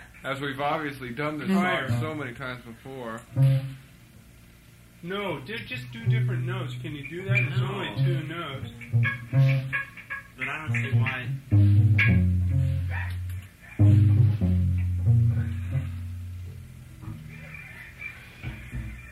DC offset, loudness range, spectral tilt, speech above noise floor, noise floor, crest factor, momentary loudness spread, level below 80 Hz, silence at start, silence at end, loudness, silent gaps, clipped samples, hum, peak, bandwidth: under 0.1%; 8 LU; -7.5 dB/octave; 25 dB; -52 dBFS; 16 dB; 19 LU; -46 dBFS; 0 s; 0 s; -26 LUFS; none; under 0.1%; none; -8 dBFS; 13 kHz